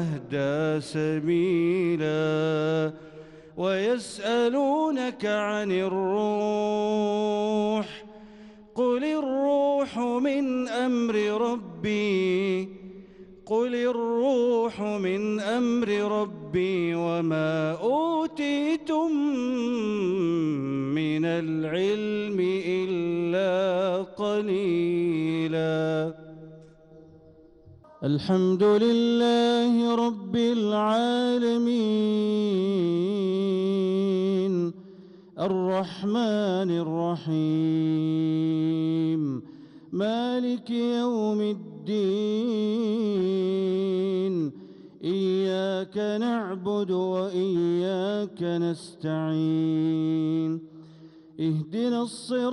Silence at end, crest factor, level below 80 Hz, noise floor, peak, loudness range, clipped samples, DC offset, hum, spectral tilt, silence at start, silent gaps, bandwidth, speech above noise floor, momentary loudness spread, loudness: 0 s; 12 dB; -66 dBFS; -53 dBFS; -14 dBFS; 4 LU; under 0.1%; under 0.1%; none; -7 dB/octave; 0 s; none; 11 kHz; 28 dB; 6 LU; -26 LUFS